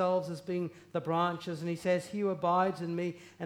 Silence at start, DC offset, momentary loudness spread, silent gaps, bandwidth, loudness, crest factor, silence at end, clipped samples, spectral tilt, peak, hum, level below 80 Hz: 0 s; under 0.1%; 8 LU; none; 14.5 kHz; -33 LUFS; 16 dB; 0 s; under 0.1%; -6.5 dB/octave; -16 dBFS; none; -76 dBFS